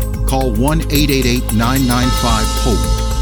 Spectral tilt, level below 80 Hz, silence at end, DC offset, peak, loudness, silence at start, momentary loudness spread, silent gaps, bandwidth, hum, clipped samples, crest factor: -5 dB/octave; -18 dBFS; 0 s; under 0.1%; -2 dBFS; -15 LUFS; 0 s; 3 LU; none; over 20 kHz; none; under 0.1%; 12 dB